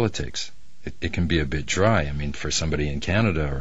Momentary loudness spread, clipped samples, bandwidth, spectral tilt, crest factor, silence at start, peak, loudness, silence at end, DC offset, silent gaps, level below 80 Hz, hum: 11 LU; under 0.1%; 8 kHz; -5 dB/octave; 20 dB; 0 s; -4 dBFS; -24 LUFS; 0 s; 3%; none; -34 dBFS; none